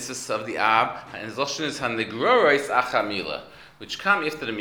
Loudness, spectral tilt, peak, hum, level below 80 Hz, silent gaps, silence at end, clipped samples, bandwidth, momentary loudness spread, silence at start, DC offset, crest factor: -23 LUFS; -3 dB/octave; -4 dBFS; none; -62 dBFS; none; 0 s; under 0.1%; over 20 kHz; 15 LU; 0 s; under 0.1%; 22 dB